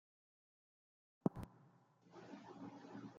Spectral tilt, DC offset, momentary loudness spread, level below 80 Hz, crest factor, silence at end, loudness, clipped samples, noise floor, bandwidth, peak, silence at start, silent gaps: -8 dB/octave; under 0.1%; 19 LU; -74 dBFS; 30 dB; 0 s; -49 LUFS; under 0.1%; -70 dBFS; 7.4 kHz; -22 dBFS; 1.25 s; none